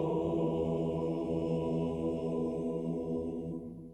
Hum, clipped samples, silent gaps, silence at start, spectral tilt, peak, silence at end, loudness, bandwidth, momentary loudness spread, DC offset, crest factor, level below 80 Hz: none; under 0.1%; none; 0 s; -9.5 dB/octave; -20 dBFS; 0 s; -34 LUFS; 9 kHz; 5 LU; under 0.1%; 14 dB; -56 dBFS